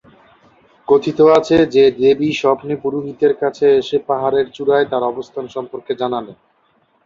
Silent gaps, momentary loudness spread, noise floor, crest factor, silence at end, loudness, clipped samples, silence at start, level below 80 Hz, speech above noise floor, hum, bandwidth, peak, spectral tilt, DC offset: none; 14 LU; -59 dBFS; 14 dB; 0.7 s; -16 LUFS; under 0.1%; 0.9 s; -54 dBFS; 44 dB; none; 7.4 kHz; -2 dBFS; -6 dB/octave; under 0.1%